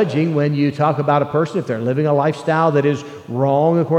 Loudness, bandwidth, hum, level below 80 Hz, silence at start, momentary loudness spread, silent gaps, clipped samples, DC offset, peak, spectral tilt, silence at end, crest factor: -18 LUFS; 9.2 kHz; none; -66 dBFS; 0 s; 5 LU; none; under 0.1%; under 0.1%; -2 dBFS; -8 dB/octave; 0 s; 14 dB